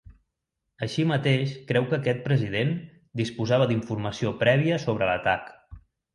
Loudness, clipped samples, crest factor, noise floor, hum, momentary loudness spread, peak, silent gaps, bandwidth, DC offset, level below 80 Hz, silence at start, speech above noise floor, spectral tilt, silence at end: -25 LUFS; under 0.1%; 18 dB; -82 dBFS; none; 9 LU; -8 dBFS; none; 11 kHz; under 0.1%; -54 dBFS; 0.8 s; 57 dB; -6.5 dB/octave; 0.35 s